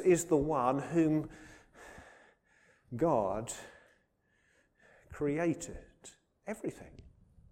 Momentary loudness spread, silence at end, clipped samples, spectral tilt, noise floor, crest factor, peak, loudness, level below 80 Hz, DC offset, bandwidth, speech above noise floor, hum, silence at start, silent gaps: 25 LU; 0.5 s; under 0.1%; -6 dB/octave; -74 dBFS; 20 dB; -16 dBFS; -33 LUFS; -60 dBFS; under 0.1%; 16 kHz; 42 dB; none; 0 s; none